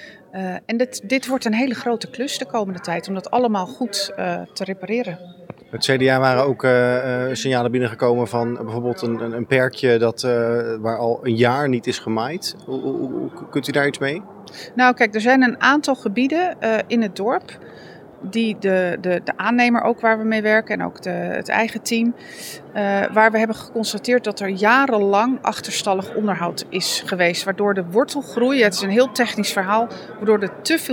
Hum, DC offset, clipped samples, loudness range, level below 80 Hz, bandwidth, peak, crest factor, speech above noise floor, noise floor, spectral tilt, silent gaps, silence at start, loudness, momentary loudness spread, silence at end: none; under 0.1%; under 0.1%; 4 LU; -68 dBFS; 18 kHz; 0 dBFS; 20 dB; 21 dB; -41 dBFS; -4.5 dB/octave; none; 0 s; -20 LUFS; 10 LU; 0 s